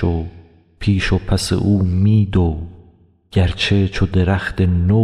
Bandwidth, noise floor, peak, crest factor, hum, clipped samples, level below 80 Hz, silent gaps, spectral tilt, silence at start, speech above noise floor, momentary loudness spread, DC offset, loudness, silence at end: 12 kHz; -50 dBFS; -4 dBFS; 12 dB; none; under 0.1%; -32 dBFS; none; -6.5 dB/octave; 0 s; 35 dB; 9 LU; under 0.1%; -17 LUFS; 0 s